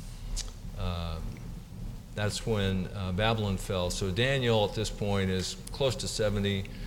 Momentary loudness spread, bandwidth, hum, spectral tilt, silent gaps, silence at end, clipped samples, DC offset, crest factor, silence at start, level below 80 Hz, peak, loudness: 14 LU; 17 kHz; none; -5 dB/octave; none; 0 s; under 0.1%; under 0.1%; 18 dB; 0 s; -42 dBFS; -12 dBFS; -31 LUFS